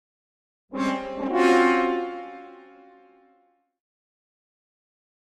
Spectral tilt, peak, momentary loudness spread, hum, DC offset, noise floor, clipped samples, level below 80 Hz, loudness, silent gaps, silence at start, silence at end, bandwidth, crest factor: -4.5 dB/octave; -6 dBFS; 20 LU; none; under 0.1%; -65 dBFS; under 0.1%; -62 dBFS; -23 LUFS; none; 0.7 s; 2.65 s; 11 kHz; 22 dB